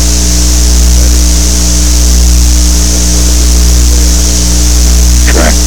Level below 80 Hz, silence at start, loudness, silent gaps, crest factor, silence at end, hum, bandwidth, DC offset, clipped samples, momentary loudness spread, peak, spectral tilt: -6 dBFS; 0 s; -7 LUFS; none; 6 dB; 0 s; 60 Hz at -5 dBFS; 18.5 kHz; 10%; under 0.1%; 1 LU; 0 dBFS; -3.5 dB/octave